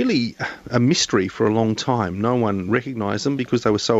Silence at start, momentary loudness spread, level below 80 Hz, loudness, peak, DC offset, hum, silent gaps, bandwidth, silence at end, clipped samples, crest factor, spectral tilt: 0 s; 5 LU; -54 dBFS; -21 LUFS; -2 dBFS; under 0.1%; none; none; 8 kHz; 0 s; under 0.1%; 18 dB; -5 dB/octave